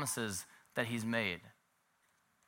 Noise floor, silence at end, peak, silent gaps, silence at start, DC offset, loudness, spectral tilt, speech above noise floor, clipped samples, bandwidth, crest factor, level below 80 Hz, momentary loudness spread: -76 dBFS; 0.95 s; -18 dBFS; none; 0 s; under 0.1%; -38 LUFS; -3.5 dB/octave; 38 dB; under 0.1%; 16.5 kHz; 24 dB; -78 dBFS; 8 LU